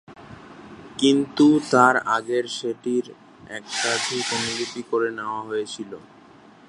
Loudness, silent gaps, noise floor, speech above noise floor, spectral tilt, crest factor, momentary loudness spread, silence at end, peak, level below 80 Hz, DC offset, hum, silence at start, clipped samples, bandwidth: -22 LUFS; none; -49 dBFS; 27 dB; -3.5 dB/octave; 22 dB; 22 LU; 0.65 s; -2 dBFS; -64 dBFS; under 0.1%; none; 0.1 s; under 0.1%; 11.5 kHz